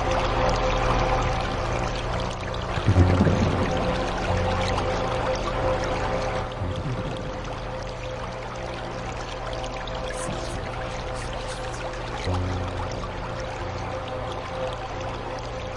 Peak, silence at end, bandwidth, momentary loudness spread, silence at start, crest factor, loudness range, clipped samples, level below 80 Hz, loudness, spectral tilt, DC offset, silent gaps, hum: -4 dBFS; 0 s; 11 kHz; 9 LU; 0 s; 22 dB; 8 LU; under 0.1%; -34 dBFS; -27 LUFS; -6 dB/octave; under 0.1%; none; 60 Hz at -40 dBFS